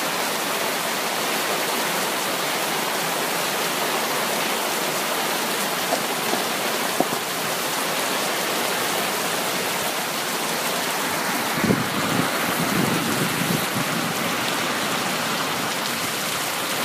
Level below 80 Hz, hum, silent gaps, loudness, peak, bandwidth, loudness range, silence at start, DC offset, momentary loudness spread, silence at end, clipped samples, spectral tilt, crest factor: -62 dBFS; none; none; -22 LUFS; -4 dBFS; 15.5 kHz; 1 LU; 0 s; under 0.1%; 2 LU; 0 s; under 0.1%; -2.5 dB/octave; 20 dB